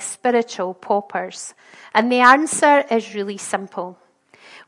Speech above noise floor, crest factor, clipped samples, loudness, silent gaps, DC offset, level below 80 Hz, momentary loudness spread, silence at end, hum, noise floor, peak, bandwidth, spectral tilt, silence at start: 30 dB; 20 dB; under 0.1%; -18 LUFS; none; under 0.1%; -70 dBFS; 18 LU; 0.1 s; none; -49 dBFS; 0 dBFS; 11.5 kHz; -3 dB/octave; 0 s